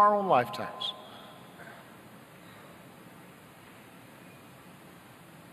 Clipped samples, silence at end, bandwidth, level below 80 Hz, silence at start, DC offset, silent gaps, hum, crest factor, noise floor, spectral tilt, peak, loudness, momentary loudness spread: under 0.1%; 1.25 s; 14 kHz; -76 dBFS; 0 s; under 0.1%; none; none; 22 dB; -52 dBFS; -5 dB/octave; -10 dBFS; -28 LUFS; 25 LU